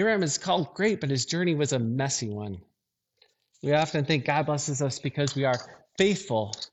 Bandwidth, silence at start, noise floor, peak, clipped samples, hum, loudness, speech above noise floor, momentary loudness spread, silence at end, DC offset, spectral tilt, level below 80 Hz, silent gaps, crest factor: 8.6 kHz; 0 s; -80 dBFS; -10 dBFS; under 0.1%; none; -27 LUFS; 53 dB; 8 LU; 0.05 s; under 0.1%; -4.5 dB/octave; -66 dBFS; none; 18 dB